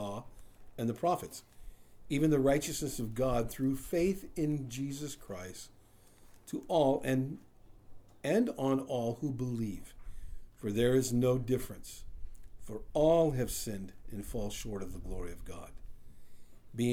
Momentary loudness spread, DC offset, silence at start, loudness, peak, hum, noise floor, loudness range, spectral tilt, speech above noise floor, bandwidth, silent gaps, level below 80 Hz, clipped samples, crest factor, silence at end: 20 LU; under 0.1%; 0 s; -33 LUFS; -16 dBFS; none; -59 dBFS; 4 LU; -6 dB/octave; 26 dB; over 20 kHz; none; -50 dBFS; under 0.1%; 18 dB; 0 s